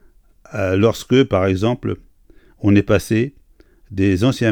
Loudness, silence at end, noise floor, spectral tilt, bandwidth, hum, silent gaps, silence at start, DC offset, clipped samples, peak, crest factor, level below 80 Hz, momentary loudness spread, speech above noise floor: -18 LUFS; 0 s; -50 dBFS; -7 dB/octave; 18.5 kHz; none; none; 0.5 s; under 0.1%; under 0.1%; -2 dBFS; 18 dB; -44 dBFS; 12 LU; 34 dB